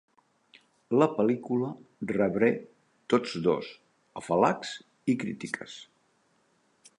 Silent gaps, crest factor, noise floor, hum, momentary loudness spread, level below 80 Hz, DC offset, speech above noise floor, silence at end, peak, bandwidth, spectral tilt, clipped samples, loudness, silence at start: none; 22 dB; -69 dBFS; none; 15 LU; -68 dBFS; under 0.1%; 41 dB; 1.15 s; -8 dBFS; 11 kHz; -6 dB/octave; under 0.1%; -29 LUFS; 0.9 s